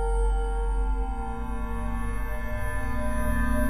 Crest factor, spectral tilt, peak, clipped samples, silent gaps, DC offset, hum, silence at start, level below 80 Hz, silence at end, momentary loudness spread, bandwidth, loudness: 12 dB; -7 dB/octave; -14 dBFS; under 0.1%; none; under 0.1%; none; 0 s; -28 dBFS; 0 s; 6 LU; 13 kHz; -31 LUFS